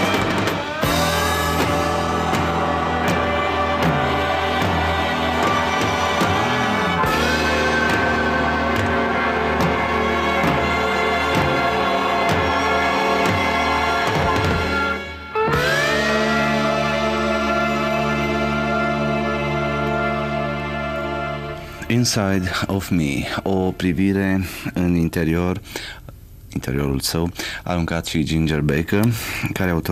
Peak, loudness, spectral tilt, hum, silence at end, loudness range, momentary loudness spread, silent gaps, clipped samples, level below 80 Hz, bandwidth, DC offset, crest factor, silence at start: -6 dBFS; -19 LUFS; -5 dB/octave; none; 0 s; 4 LU; 6 LU; none; under 0.1%; -36 dBFS; 16 kHz; under 0.1%; 14 dB; 0 s